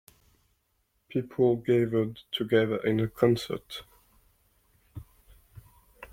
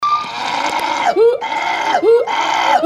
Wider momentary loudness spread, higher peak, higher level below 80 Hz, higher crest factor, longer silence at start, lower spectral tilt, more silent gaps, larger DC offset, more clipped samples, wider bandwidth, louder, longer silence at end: first, 21 LU vs 6 LU; second, -8 dBFS vs -2 dBFS; about the same, -60 dBFS vs -58 dBFS; first, 22 dB vs 14 dB; first, 1.15 s vs 0 s; first, -7 dB/octave vs -2 dB/octave; neither; neither; neither; first, 16.5 kHz vs 13.5 kHz; second, -27 LUFS vs -15 LUFS; about the same, 0.05 s vs 0 s